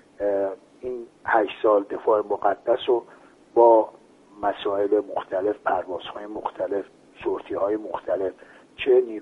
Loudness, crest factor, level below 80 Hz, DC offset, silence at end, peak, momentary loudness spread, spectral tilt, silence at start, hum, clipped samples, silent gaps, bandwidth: -24 LUFS; 20 dB; -64 dBFS; under 0.1%; 0 s; -4 dBFS; 12 LU; -6.5 dB/octave; 0.2 s; none; under 0.1%; none; 5.8 kHz